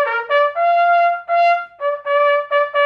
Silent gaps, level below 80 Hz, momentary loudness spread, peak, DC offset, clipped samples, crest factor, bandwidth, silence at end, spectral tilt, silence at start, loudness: none; -74 dBFS; 5 LU; -4 dBFS; under 0.1%; under 0.1%; 12 dB; 6.2 kHz; 0 s; -0.5 dB/octave; 0 s; -16 LUFS